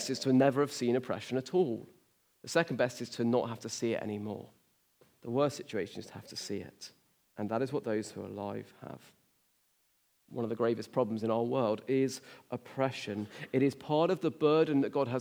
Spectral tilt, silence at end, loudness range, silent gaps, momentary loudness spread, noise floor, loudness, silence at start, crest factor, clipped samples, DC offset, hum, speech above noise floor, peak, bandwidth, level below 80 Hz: -5.5 dB/octave; 0 s; 8 LU; none; 17 LU; -73 dBFS; -33 LUFS; 0 s; 20 dB; under 0.1%; under 0.1%; none; 41 dB; -12 dBFS; over 20 kHz; -82 dBFS